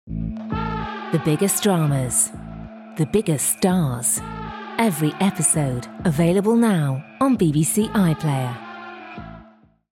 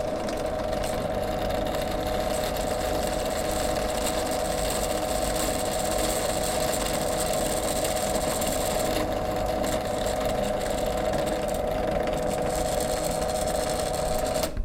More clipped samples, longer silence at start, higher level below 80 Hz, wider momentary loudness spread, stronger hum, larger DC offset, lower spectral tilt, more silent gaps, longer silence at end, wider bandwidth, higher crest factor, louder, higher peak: neither; about the same, 0.05 s vs 0 s; second, -44 dBFS vs -38 dBFS; first, 18 LU vs 2 LU; neither; neither; first, -5 dB/octave vs -3.5 dB/octave; neither; first, 0.55 s vs 0 s; about the same, 17 kHz vs 17 kHz; about the same, 16 dB vs 16 dB; first, -20 LUFS vs -27 LUFS; first, -6 dBFS vs -12 dBFS